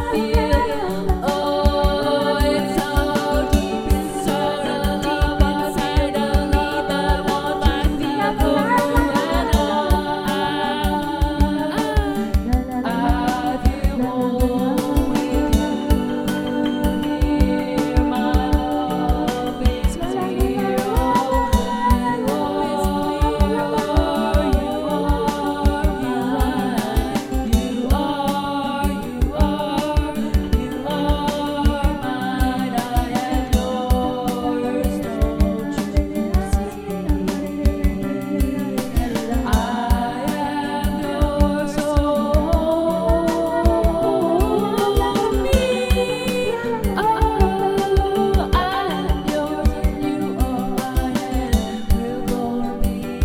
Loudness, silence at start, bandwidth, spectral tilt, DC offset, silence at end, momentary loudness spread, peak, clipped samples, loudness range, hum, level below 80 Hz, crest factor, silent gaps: -20 LUFS; 0 s; 17.5 kHz; -6 dB/octave; under 0.1%; 0 s; 4 LU; -2 dBFS; under 0.1%; 3 LU; none; -24 dBFS; 18 dB; none